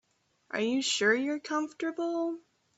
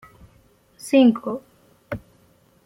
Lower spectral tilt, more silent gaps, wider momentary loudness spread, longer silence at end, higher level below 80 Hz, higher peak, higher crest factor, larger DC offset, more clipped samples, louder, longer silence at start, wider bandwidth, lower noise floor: second, -2.5 dB/octave vs -5.5 dB/octave; neither; second, 10 LU vs 19 LU; second, 0.4 s vs 0.65 s; second, -78 dBFS vs -56 dBFS; second, -14 dBFS vs -6 dBFS; about the same, 18 dB vs 18 dB; neither; neither; second, -30 LUFS vs -19 LUFS; second, 0.55 s vs 0.85 s; second, 8.4 kHz vs 13 kHz; first, -63 dBFS vs -58 dBFS